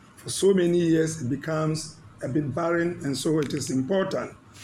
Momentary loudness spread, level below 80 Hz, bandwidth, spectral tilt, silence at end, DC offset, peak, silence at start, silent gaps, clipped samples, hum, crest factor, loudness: 11 LU; -60 dBFS; 15 kHz; -5.5 dB/octave; 0 s; under 0.1%; -10 dBFS; 0.2 s; none; under 0.1%; none; 16 dB; -25 LUFS